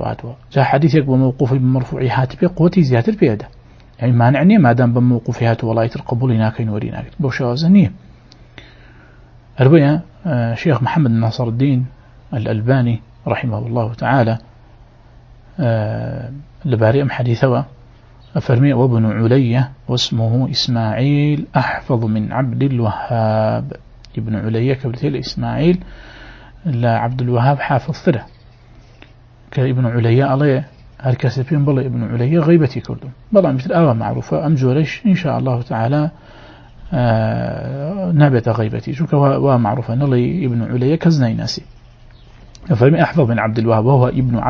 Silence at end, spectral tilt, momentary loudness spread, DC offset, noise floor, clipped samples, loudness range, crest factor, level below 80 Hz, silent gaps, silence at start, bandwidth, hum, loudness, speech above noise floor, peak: 0 s; -8 dB/octave; 10 LU; under 0.1%; -43 dBFS; under 0.1%; 4 LU; 16 dB; -42 dBFS; none; 0 s; 7 kHz; none; -16 LUFS; 29 dB; 0 dBFS